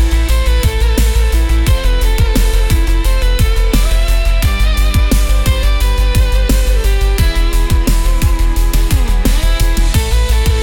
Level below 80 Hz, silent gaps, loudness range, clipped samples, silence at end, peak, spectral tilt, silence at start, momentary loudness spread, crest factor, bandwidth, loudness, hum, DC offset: -10 dBFS; none; 1 LU; under 0.1%; 0 s; -2 dBFS; -5 dB/octave; 0 s; 1 LU; 8 dB; 17.5 kHz; -14 LUFS; none; under 0.1%